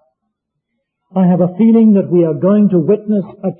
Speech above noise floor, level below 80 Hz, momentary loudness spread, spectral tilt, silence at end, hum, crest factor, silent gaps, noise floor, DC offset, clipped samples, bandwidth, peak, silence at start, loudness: 62 dB; -60 dBFS; 7 LU; -15 dB/octave; 0.05 s; none; 10 dB; none; -73 dBFS; under 0.1%; under 0.1%; 3.4 kHz; -2 dBFS; 1.15 s; -12 LUFS